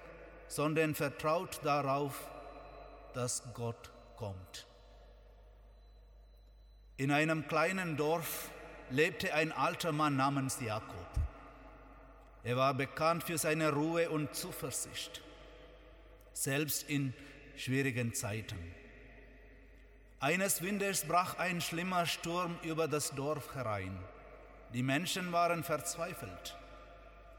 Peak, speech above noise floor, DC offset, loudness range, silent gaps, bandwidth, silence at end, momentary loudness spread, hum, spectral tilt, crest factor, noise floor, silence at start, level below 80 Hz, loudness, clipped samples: -16 dBFS; 23 dB; under 0.1%; 7 LU; none; 19 kHz; 0 s; 20 LU; none; -4 dB/octave; 20 dB; -59 dBFS; 0 s; -56 dBFS; -35 LUFS; under 0.1%